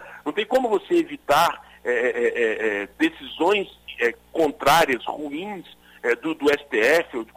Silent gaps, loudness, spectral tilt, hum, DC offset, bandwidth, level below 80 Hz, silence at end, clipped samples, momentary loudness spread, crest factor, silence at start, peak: none; -22 LUFS; -3.5 dB/octave; none; under 0.1%; 16 kHz; -56 dBFS; 0.1 s; under 0.1%; 11 LU; 16 dB; 0 s; -6 dBFS